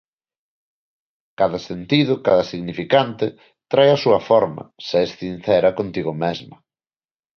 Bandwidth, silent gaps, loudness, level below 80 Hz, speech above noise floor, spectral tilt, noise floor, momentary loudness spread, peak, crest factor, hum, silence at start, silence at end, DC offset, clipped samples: 6.6 kHz; none; -19 LUFS; -56 dBFS; over 71 dB; -6.5 dB/octave; under -90 dBFS; 11 LU; -2 dBFS; 18 dB; none; 1.4 s; 0.85 s; under 0.1%; under 0.1%